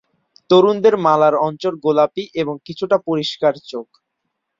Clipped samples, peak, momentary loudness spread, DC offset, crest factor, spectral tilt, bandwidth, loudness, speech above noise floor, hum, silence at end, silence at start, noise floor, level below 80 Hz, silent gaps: under 0.1%; -2 dBFS; 12 LU; under 0.1%; 16 dB; -6.5 dB/octave; 7.6 kHz; -17 LUFS; 59 dB; none; 0.75 s; 0.5 s; -75 dBFS; -62 dBFS; none